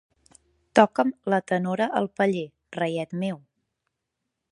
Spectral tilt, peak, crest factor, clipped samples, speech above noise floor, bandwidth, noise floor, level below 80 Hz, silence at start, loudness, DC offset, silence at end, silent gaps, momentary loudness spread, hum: -6.5 dB/octave; -2 dBFS; 24 dB; under 0.1%; 58 dB; 11.5 kHz; -82 dBFS; -72 dBFS; 0.75 s; -25 LUFS; under 0.1%; 1.15 s; none; 12 LU; none